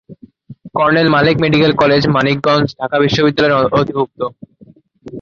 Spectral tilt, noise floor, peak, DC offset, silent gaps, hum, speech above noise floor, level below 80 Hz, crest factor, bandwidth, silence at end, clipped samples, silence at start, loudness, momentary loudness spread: -6.5 dB/octave; -45 dBFS; -2 dBFS; under 0.1%; none; none; 32 dB; -46 dBFS; 14 dB; 7.4 kHz; 0 s; under 0.1%; 0.1 s; -13 LUFS; 10 LU